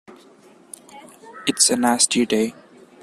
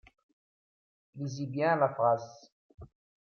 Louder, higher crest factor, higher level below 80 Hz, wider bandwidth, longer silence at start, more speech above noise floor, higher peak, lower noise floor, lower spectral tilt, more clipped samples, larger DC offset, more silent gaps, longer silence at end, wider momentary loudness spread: first, -18 LUFS vs -30 LUFS; about the same, 22 dB vs 20 dB; about the same, -64 dBFS vs -68 dBFS; first, 14.5 kHz vs 6.8 kHz; second, 0.1 s vs 1.15 s; second, 31 dB vs over 60 dB; first, 0 dBFS vs -14 dBFS; second, -50 dBFS vs under -90 dBFS; second, -2 dB/octave vs -7 dB/octave; neither; neither; second, none vs 2.52-2.78 s; about the same, 0.5 s vs 0.5 s; first, 17 LU vs 14 LU